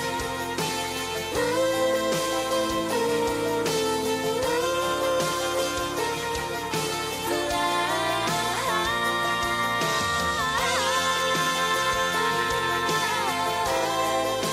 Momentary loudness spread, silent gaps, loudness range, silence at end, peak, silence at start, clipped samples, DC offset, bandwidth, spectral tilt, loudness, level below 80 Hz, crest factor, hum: 4 LU; none; 3 LU; 0 s; -12 dBFS; 0 s; under 0.1%; under 0.1%; 16 kHz; -2.5 dB/octave; -25 LUFS; -50 dBFS; 14 dB; none